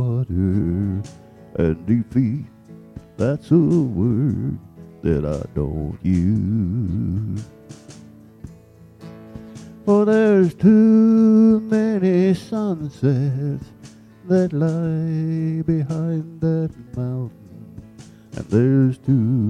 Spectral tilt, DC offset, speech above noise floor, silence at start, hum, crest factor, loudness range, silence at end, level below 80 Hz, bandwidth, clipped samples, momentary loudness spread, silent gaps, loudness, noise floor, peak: -9.5 dB/octave; under 0.1%; 28 dB; 0 s; none; 16 dB; 9 LU; 0 s; -42 dBFS; 9.2 kHz; under 0.1%; 18 LU; none; -19 LUFS; -46 dBFS; -4 dBFS